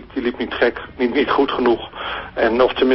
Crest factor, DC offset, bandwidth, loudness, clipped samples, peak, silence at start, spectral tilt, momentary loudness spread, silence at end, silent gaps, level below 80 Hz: 14 dB; under 0.1%; 5.8 kHz; -19 LUFS; under 0.1%; -4 dBFS; 0 s; -9 dB/octave; 9 LU; 0 s; none; -44 dBFS